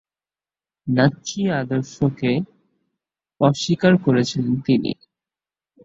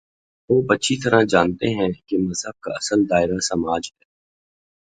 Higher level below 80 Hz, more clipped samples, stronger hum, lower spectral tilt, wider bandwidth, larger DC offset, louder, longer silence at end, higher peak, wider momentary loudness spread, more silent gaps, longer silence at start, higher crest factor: second, -56 dBFS vs -50 dBFS; neither; neither; first, -6 dB/octave vs -4.5 dB/octave; second, 8 kHz vs 9.4 kHz; neither; about the same, -20 LUFS vs -20 LUFS; about the same, 0.9 s vs 1 s; about the same, -2 dBFS vs 0 dBFS; about the same, 9 LU vs 9 LU; neither; first, 0.85 s vs 0.5 s; about the same, 20 dB vs 20 dB